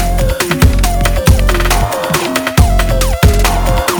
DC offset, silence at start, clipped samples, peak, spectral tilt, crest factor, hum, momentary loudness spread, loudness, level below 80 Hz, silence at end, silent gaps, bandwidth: under 0.1%; 0 s; under 0.1%; 0 dBFS; -4.5 dB/octave; 10 dB; none; 3 LU; -12 LUFS; -14 dBFS; 0 s; none; over 20 kHz